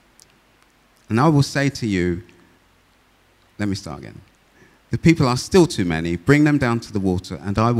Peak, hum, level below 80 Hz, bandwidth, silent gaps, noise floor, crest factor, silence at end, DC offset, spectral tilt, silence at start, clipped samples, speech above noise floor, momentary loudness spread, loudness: 0 dBFS; none; -44 dBFS; 14.5 kHz; none; -57 dBFS; 20 dB; 0 s; under 0.1%; -6.5 dB/octave; 1.1 s; under 0.1%; 39 dB; 13 LU; -19 LUFS